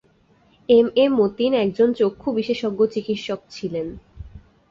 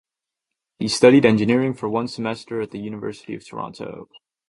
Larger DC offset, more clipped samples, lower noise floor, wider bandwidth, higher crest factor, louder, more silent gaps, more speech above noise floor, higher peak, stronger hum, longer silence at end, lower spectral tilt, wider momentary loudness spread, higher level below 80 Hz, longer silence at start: neither; neither; second, -58 dBFS vs -84 dBFS; second, 7.4 kHz vs 11.5 kHz; about the same, 16 dB vs 20 dB; about the same, -20 LUFS vs -19 LUFS; neither; second, 38 dB vs 64 dB; second, -4 dBFS vs 0 dBFS; neither; about the same, 0.35 s vs 0.45 s; about the same, -6.5 dB/octave vs -5.5 dB/octave; second, 13 LU vs 20 LU; first, -50 dBFS vs -60 dBFS; about the same, 0.7 s vs 0.8 s